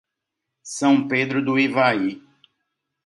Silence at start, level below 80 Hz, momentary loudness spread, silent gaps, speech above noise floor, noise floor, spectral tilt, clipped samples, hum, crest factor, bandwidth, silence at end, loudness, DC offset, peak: 0.65 s; -70 dBFS; 8 LU; none; 62 dB; -82 dBFS; -5 dB/octave; under 0.1%; none; 18 dB; 11.5 kHz; 0.85 s; -20 LUFS; under 0.1%; -4 dBFS